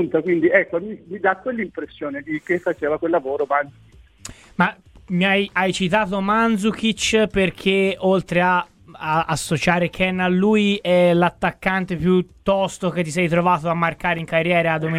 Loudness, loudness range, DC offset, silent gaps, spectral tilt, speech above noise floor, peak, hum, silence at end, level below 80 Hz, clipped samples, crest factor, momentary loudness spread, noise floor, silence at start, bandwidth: -20 LUFS; 5 LU; under 0.1%; none; -5.5 dB/octave; 22 dB; 0 dBFS; none; 0 s; -48 dBFS; under 0.1%; 20 dB; 10 LU; -41 dBFS; 0 s; 14.5 kHz